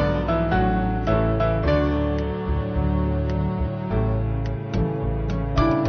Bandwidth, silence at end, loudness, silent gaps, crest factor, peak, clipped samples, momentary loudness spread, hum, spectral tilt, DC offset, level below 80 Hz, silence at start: 6.4 kHz; 0 s; -23 LUFS; none; 14 dB; -8 dBFS; under 0.1%; 5 LU; none; -9 dB/octave; under 0.1%; -28 dBFS; 0 s